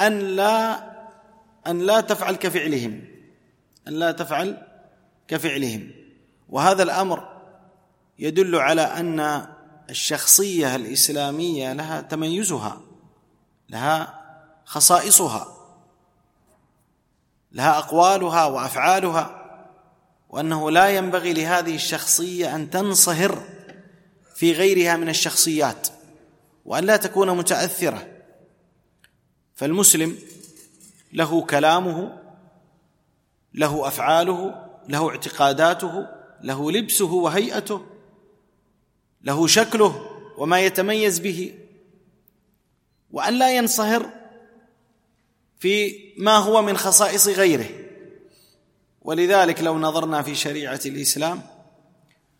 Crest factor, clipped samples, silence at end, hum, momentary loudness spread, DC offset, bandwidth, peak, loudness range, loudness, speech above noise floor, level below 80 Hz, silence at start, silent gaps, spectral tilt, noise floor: 22 dB; under 0.1%; 0.95 s; none; 16 LU; under 0.1%; 16.5 kHz; 0 dBFS; 6 LU; -20 LUFS; 47 dB; -66 dBFS; 0 s; none; -2.5 dB/octave; -67 dBFS